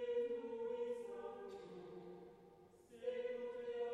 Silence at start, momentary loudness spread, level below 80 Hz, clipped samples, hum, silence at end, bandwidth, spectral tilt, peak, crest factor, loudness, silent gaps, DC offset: 0 s; 19 LU; -82 dBFS; under 0.1%; none; 0 s; 10 kHz; -6 dB/octave; -32 dBFS; 14 dB; -47 LUFS; none; under 0.1%